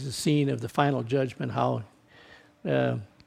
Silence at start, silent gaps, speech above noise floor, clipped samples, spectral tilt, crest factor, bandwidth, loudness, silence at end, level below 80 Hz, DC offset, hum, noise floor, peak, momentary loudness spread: 0 s; none; 27 dB; under 0.1%; -6 dB/octave; 22 dB; 15.5 kHz; -28 LUFS; 0.2 s; -64 dBFS; under 0.1%; none; -54 dBFS; -8 dBFS; 8 LU